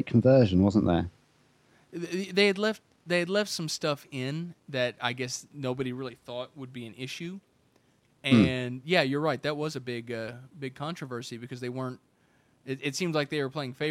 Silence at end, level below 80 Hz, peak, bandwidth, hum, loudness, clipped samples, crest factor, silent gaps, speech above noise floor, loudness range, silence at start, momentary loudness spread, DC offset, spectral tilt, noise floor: 0 s; -58 dBFS; -8 dBFS; 15.5 kHz; none; -29 LUFS; under 0.1%; 22 dB; none; 38 dB; 8 LU; 0 s; 17 LU; under 0.1%; -5.5 dB/octave; -66 dBFS